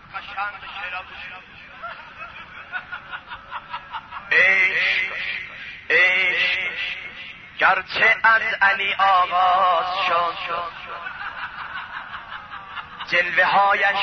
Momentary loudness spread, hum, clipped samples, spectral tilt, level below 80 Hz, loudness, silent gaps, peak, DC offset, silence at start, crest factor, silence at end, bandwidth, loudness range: 20 LU; none; under 0.1%; -2.5 dB/octave; -58 dBFS; -19 LUFS; none; -6 dBFS; under 0.1%; 0 s; 16 dB; 0 s; 6.6 kHz; 14 LU